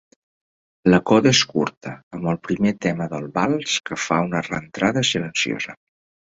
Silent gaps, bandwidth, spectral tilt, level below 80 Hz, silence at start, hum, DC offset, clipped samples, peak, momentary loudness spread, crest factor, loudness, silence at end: 1.77-1.81 s, 2.03-2.11 s; 8 kHz; -4.5 dB/octave; -54 dBFS; 0.85 s; none; under 0.1%; under 0.1%; -2 dBFS; 13 LU; 20 dB; -21 LUFS; 0.65 s